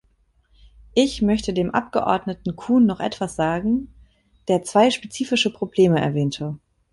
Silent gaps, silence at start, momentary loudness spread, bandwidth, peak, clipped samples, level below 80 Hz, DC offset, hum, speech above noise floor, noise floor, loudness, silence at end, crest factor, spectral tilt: none; 0.95 s; 11 LU; 11.5 kHz; -4 dBFS; under 0.1%; -48 dBFS; under 0.1%; none; 42 dB; -62 dBFS; -21 LUFS; 0.35 s; 18 dB; -5.5 dB/octave